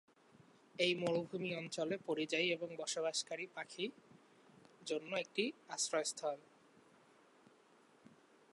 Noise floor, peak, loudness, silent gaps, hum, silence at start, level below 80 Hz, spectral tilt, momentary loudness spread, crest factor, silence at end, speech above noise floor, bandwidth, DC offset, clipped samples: -68 dBFS; -20 dBFS; -40 LUFS; none; none; 0.8 s; under -90 dBFS; -3 dB/octave; 9 LU; 22 dB; 2.1 s; 28 dB; 11.5 kHz; under 0.1%; under 0.1%